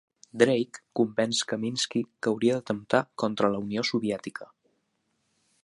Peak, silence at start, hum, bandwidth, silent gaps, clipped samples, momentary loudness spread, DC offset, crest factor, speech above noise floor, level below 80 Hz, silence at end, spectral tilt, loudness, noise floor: -6 dBFS; 0.35 s; none; 11.5 kHz; none; under 0.1%; 9 LU; under 0.1%; 24 dB; 48 dB; -70 dBFS; 1.2 s; -4.5 dB/octave; -27 LUFS; -75 dBFS